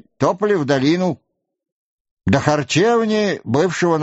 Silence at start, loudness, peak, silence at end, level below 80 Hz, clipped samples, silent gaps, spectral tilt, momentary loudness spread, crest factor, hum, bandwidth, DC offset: 0.2 s; -18 LUFS; 0 dBFS; 0 s; -50 dBFS; under 0.1%; 1.72-2.05 s, 2.11-2.17 s; -5 dB/octave; 5 LU; 18 dB; none; 8 kHz; under 0.1%